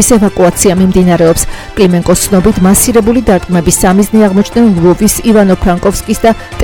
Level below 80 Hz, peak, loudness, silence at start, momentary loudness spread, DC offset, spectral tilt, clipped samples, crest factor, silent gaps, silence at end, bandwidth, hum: -24 dBFS; 0 dBFS; -8 LUFS; 0 s; 4 LU; under 0.1%; -5 dB/octave; 0.9%; 8 dB; none; 0 s; 18.5 kHz; none